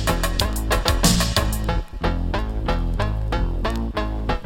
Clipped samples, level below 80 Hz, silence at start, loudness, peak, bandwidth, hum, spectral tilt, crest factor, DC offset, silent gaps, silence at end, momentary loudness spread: under 0.1%; -24 dBFS; 0 s; -23 LUFS; -2 dBFS; 17 kHz; none; -4 dB/octave; 18 dB; under 0.1%; none; 0 s; 8 LU